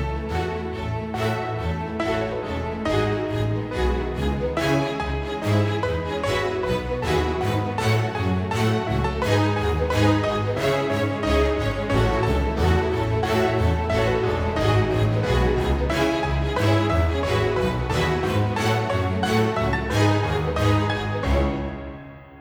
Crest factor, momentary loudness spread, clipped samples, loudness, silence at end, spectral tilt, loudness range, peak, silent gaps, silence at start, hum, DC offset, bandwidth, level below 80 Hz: 16 dB; 6 LU; under 0.1%; -23 LUFS; 0 s; -6.5 dB/octave; 3 LU; -8 dBFS; none; 0 s; none; under 0.1%; 18.5 kHz; -32 dBFS